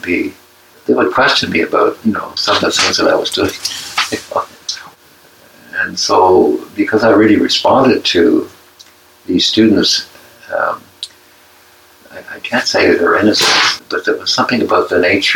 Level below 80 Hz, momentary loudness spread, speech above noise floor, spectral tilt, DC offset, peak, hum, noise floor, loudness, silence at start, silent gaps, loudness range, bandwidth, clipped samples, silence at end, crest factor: -54 dBFS; 14 LU; 33 dB; -3 dB/octave; under 0.1%; 0 dBFS; none; -45 dBFS; -12 LUFS; 0.05 s; none; 5 LU; 18 kHz; under 0.1%; 0 s; 14 dB